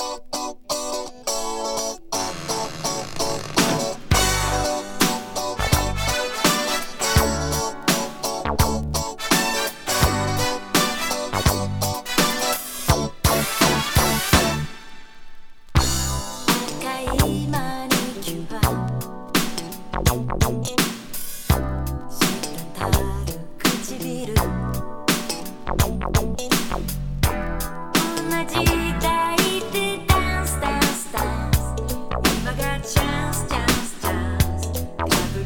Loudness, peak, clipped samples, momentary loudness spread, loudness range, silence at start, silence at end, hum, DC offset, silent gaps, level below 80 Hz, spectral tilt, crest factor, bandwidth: -22 LUFS; 0 dBFS; under 0.1%; 9 LU; 3 LU; 0 s; 0 s; none; under 0.1%; none; -30 dBFS; -3.5 dB/octave; 22 dB; over 20 kHz